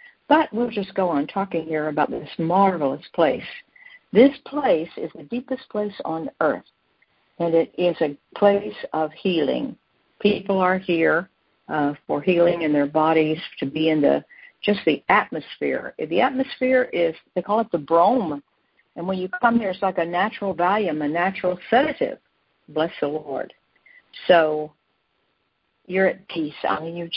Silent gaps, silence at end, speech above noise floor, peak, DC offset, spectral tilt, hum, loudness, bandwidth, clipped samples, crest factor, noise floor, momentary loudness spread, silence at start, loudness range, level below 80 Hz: none; 0 s; 49 dB; -2 dBFS; under 0.1%; -10.5 dB/octave; none; -22 LUFS; 5.6 kHz; under 0.1%; 20 dB; -71 dBFS; 10 LU; 0.3 s; 4 LU; -62 dBFS